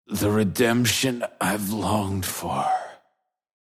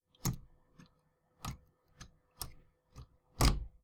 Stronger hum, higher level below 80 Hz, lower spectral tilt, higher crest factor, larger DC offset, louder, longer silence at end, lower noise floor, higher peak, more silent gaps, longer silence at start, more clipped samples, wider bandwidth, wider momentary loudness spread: neither; second, -60 dBFS vs -44 dBFS; about the same, -4.5 dB/octave vs -4 dB/octave; second, 18 dB vs 26 dB; neither; first, -24 LUFS vs -38 LUFS; first, 0.75 s vs 0.15 s; about the same, -72 dBFS vs -74 dBFS; first, -8 dBFS vs -14 dBFS; neither; second, 0.1 s vs 0.25 s; neither; second, 15.5 kHz vs over 20 kHz; second, 7 LU vs 26 LU